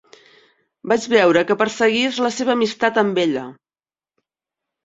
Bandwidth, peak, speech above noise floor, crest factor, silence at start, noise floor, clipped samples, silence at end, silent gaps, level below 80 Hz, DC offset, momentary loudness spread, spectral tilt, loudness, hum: 8 kHz; -2 dBFS; over 72 dB; 18 dB; 0.85 s; under -90 dBFS; under 0.1%; 1.3 s; none; -64 dBFS; under 0.1%; 8 LU; -4 dB/octave; -18 LUFS; none